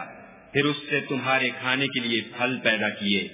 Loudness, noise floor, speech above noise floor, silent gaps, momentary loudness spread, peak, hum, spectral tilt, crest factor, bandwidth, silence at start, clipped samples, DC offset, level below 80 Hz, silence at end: -24 LUFS; -45 dBFS; 20 dB; none; 4 LU; -6 dBFS; none; -2 dB/octave; 20 dB; 3.9 kHz; 0 s; under 0.1%; under 0.1%; -66 dBFS; 0 s